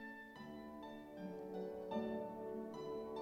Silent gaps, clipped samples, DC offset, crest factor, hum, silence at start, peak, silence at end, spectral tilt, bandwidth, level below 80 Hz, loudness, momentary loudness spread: none; under 0.1%; under 0.1%; 16 dB; none; 0 s; -30 dBFS; 0 s; -7 dB/octave; 16.5 kHz; -74 dBFS; -48 LUFS; 9 LU